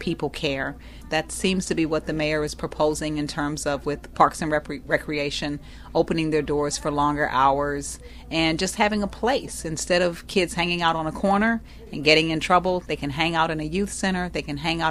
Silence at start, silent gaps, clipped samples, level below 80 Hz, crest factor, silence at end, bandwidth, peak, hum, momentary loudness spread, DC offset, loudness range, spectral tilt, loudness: 0 s; none; under 0.1%; -42 dBFS; 22 dB; 0 s; 15 kHz; -2 dBFS; none; 8 LU; under 0.1%; 3 LU; -4 dB/octave; -24 LUFS